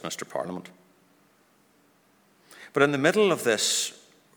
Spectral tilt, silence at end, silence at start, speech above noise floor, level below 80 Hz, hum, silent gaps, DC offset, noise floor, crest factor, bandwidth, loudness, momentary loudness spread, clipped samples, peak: -3 dB/octave; 0.45 s; 0.05 s; 38 dB; -78 dBFS; none; none; under 0.1%; -63 dBFS; 24 dB; over 20 kHz; -25 LUFS; 12 LU; under 0.1%; -6 dBFS